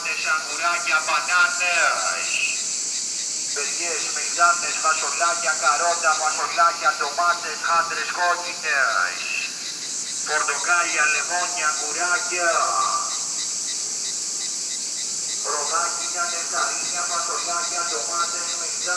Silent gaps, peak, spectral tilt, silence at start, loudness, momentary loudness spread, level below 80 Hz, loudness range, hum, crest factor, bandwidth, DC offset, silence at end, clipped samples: none; -4 dBFS; 1.5 dB/octave; 0 s; -21 LUFS; 6 LU; -76 dBFS; 3 LU; none; 18 dB; 11 kHz; under 0.1%; 0 s; under 0.1%